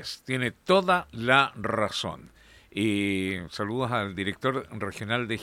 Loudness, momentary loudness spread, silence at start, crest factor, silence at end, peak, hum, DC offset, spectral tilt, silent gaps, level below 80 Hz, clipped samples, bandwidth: -27 LUFS; 11 LU; 0 s; 22 dB; 0 s; -6 dBFS; none; under 0.1%; -5 dB/octave; none; -58 dBFS; under 0.1%; 16.5 kHz